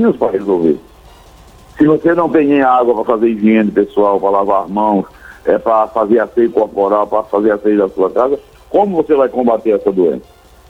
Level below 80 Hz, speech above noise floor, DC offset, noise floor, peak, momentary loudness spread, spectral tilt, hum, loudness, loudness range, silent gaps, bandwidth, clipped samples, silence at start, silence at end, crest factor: -46 dBFS; 28 dB; under 0.1%; -40 dBFS; 0 dBFS; 5 LU; -8.5 dB/octave; none; -13 LUFS; 2 LU; none; 8.4 kHz; under 0.1%; 0 s; 0.5 s; 12 dB